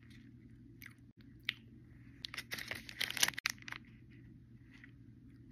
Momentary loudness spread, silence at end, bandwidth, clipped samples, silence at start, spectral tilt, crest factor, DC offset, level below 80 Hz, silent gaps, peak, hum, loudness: 26 LU; 0 s; 15.5 kHz; under 0.1%; 0 s; -0.5 dB/octave; 36 dB; under 0.1%; -68 dBFS; 1.12-1.16 s, 3.40-3.44 s; -10 dBFS; none; -39 LUFS